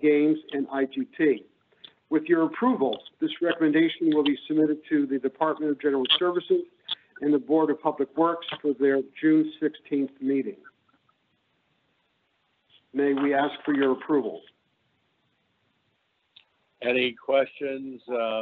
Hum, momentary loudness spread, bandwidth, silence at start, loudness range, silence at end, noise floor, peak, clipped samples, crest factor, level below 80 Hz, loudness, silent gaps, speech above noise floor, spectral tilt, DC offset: none; 9 LU; 4.3 kHz; 0 s; 7 LU; 0 s; -72 dBFS; -6 dBFS; under 0.1%; 20 dB; -76 dBFS; -25 LUFS; none; 48 dB; -3 dB/octave; under 0.1%